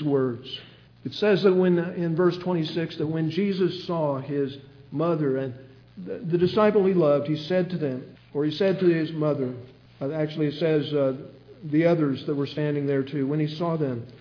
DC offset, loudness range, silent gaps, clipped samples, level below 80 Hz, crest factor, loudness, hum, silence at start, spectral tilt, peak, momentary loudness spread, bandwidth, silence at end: under 0.1%; 3 LU; none; under 0.1%; -66 dBFS; 16 dB; -25 LUFS; none; 0 s; -8.5 dB/octave; -8 dBFS; 15 LU; 5.4 kHz; 0 s